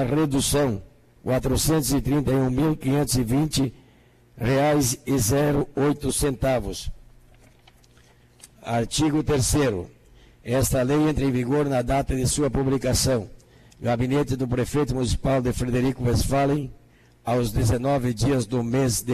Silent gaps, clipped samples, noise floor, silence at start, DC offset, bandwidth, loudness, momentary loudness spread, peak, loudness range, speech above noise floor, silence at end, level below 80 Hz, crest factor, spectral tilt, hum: none; under 0.1%; -55 dBFS; 0 s; under 0.1%; 14 kHz; -23 LUFS; 7 LU; -12 dBFS; 3 LU; 33 dB; 0 s; -38 dBFS; 12 dB; -5.5 dB/octave; none